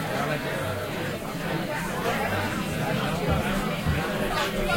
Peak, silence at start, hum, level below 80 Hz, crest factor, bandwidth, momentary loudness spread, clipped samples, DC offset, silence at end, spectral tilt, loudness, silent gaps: -10 dBFS; 0 s; none; -40 dBFS; 16 dB; 16.5 kHz; 4 LU; under 0.1%; under 0.1%; 0 s; -5 dB/octave; -27 LUFS; none